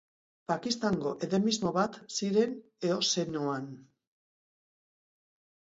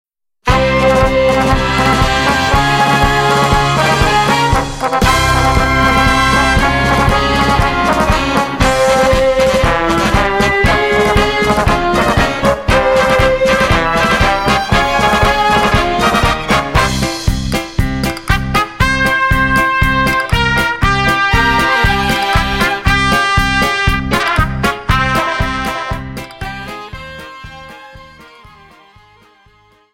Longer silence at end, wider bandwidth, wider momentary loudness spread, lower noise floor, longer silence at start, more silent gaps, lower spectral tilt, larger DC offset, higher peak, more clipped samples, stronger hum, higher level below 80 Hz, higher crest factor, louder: first, 1.9 s vs 1.7 s; second, 8 kHz vs 16.5 kHz; about the same, 7 LU vs 6 LU; first, under -90 dBFS vs -49 dBFS; about the same, 0.5 s vs 0.45 s; neither; about the same, -4.5 dB/octave vs -4.5 dB/octave; second, under 0.1% vs 0.2%; second, -14 dBFS vs 0 dBFS; neither; neither; second, -70 dBFS vs -22 dBFS; first, 20 dB vs 12 dB; second, -31 LUFS vs -12 LUFS